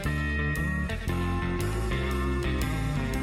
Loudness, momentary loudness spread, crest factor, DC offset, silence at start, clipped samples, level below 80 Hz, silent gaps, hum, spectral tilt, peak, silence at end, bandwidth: -29 LUFS; 2 LU; 8 dB; under 0.1%; 0 s; under 0.1%; -32 dBFS; none; none; -6 dB/octave; -20 dBFS; 0 s; 16.5 kHz